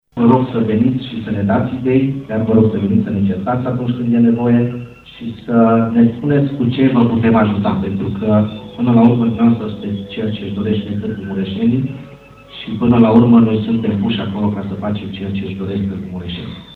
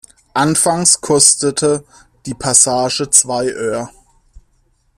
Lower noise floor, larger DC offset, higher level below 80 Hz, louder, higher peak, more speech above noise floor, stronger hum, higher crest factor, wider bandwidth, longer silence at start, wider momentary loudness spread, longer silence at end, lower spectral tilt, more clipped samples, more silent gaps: second, -37 dBFS vs -58 dBFS; neither; first, -44 dBFS vs -50 dBFS; second, -15 LUFS vs -12 LUFS; about the same, 0 dBFS vs 0 dBFS; second, 22 dB vs 44 dB; neither; about the same, 14 dB vs 16 dB; second, 4.3 kHz vs over 20 kHz; second, 0.15 s vs 0.35 s; about the same, 12 LU vs 14 LU; second, 0 s vs 1.1 s; first, -10 dB/octave vs -2.5 dB/octave; neither; neither